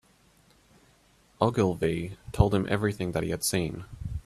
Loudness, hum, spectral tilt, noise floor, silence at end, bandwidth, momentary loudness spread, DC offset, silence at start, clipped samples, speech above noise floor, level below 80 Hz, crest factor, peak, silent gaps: -28 LUFS; none; -5.5 dB/octave; -62 dBFS; 0.05 s; 15 kHz; 11 LU; under 0.1%; 1.4 s; under 0.1%; 35 dB; -44 dBFS; 24 dB; -6 dBFS; none